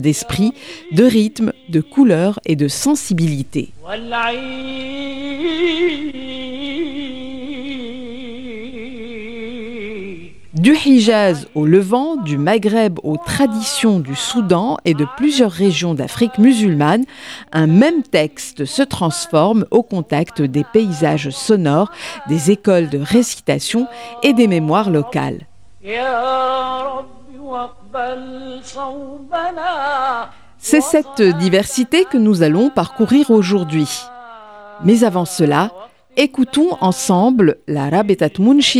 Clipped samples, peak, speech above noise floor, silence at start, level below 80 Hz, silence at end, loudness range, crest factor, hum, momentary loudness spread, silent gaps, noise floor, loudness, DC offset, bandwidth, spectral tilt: under 0.1%; 0 dBFS; 22 dB; 0 s; -50 dBFS; 0 s; 9 LU; 16 dB; none; 16 LU; none; -37 dBFS; -15 LUFS; 0.2%; 15.5 kHz; -5.5 dB/octave